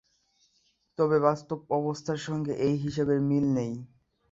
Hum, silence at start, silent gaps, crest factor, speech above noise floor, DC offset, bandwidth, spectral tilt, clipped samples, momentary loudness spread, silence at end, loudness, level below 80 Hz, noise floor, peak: none; 1 s; none; 20 dB; 44 dB; under 0.1%; 7.8 kHz; -7.5 dB/octave; under 0.1%; 10 LU; 0.45 s; -28 LUFS; -62 dBFS; -71 dBFS; -8 dBFS